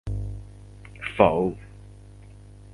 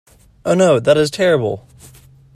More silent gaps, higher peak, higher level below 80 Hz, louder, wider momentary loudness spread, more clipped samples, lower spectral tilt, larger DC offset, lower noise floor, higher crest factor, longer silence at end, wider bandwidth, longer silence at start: neither; about the same, 0 dBFS vs 0 dBFS; first, -42 dBFS vs -50 dBFS; second, -25 LUFS vs -15 LUFS; first, 26 LU vs 13 LU; neither; first, -7.5 dB/octave vs -5.5 dB/octave; neither; about the same, -46 dBFS vs -44 dBFS; first, 28 dB vs 16 dB; second, 0 s vs 0.75 s; second, 11.5 kHz vs 14 kHz; second, 0.05 s vs 0.45 s